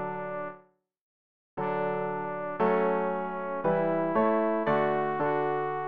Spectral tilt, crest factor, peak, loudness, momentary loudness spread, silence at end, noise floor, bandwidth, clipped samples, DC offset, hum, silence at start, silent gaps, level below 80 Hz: -9.5 dB/octave; 14 dB; -14 dBFS; -29 LUFS; 9 LU; 0 s; -58 dBFS; 5 kHz; under 0.1%; 0.3%; none; 0 s; 1.01-1.57 s; -66 dBFS